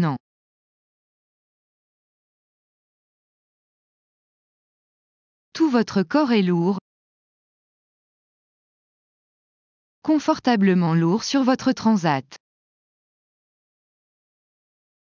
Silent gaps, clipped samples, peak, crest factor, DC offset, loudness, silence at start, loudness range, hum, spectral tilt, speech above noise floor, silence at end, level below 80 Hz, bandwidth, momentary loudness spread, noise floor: 0.20-5.52 s, 6.81-10.02 s; under 0.1%; -6 dBFS; 20 dB; under 0.1%; -20 LUFS; 0 s; 10 LU; none; -6.5 dB/octave; over 71 dB; 2.8 s; -68 dBFS; 7.4 kHz; 8 LU; under -90 dBFS